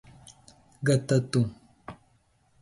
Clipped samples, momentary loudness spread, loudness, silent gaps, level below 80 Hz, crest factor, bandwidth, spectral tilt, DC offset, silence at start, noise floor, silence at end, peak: under 0.1%; 23 LU; -27 LUFS; none; -60 dBFS; 18 dB; 11.5 kHz; -6.5 dB/octave; under 0.1%; 0.8 s; -66 dBFS; 0.65 s; -12 dBFS